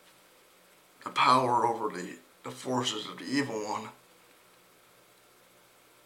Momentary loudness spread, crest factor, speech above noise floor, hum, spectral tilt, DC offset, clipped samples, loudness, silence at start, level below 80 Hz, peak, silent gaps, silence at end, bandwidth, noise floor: 21 LU; 24 dB; 31 dB; none; -4 dB/octave; under 0.1%; under 0.1%; -29 LUFS; 1.05 s; -82 dBFS; -8 dBFS; none; 2.1 s; 17 kHz; -60 dBFS